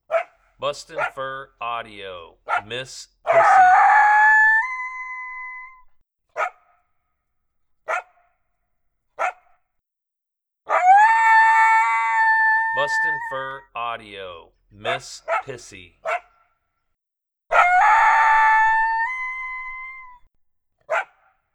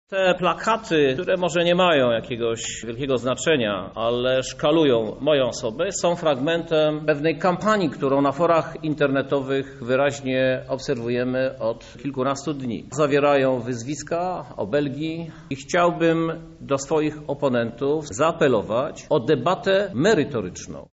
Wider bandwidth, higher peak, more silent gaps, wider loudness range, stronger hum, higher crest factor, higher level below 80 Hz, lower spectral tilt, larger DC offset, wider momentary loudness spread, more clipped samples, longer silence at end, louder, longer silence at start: first, 11 kHz vs 8 kHz; first, -4 dBFS vs -8 dBFS; neither; first, 17 LU vs 3 LU; neither; about the same, 18 dB vs 14 dB; about the same, -56 dBFS vs -52 dBFS; second, -2 dB/octave vs -4 dB/octave; neither; first, 22 LU vs 9 LU; neither; first, 0.5 s vs 0.1 s; first, -18 LUFS vs -22 LUFS; about the same, 0.1 s vs 0.1 s